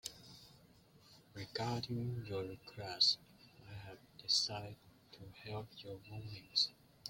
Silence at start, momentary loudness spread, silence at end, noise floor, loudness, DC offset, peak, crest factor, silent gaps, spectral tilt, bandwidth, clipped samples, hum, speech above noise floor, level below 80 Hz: 0.05 s; 24 LU; 0 s; -66 dBFS; -38 LUFS; under 0.1%; -18 dBFS; 24 dB; none; -3.5 dB/octave; 16.5 kHz; under 0.1%; none; 25 dB; -72 dBFS